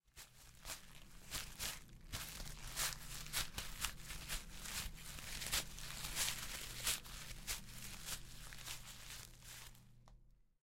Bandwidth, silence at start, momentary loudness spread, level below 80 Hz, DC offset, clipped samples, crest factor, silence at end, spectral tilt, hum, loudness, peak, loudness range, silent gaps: 16.5 kHz; 0.05 s; 14 LU; -56 dBFS; under 0.1%; under 0.1%; 30 dB; 0.2 s; -1 dB/octave; none; -45 LUFS; -18 dBFS; 5 LU; none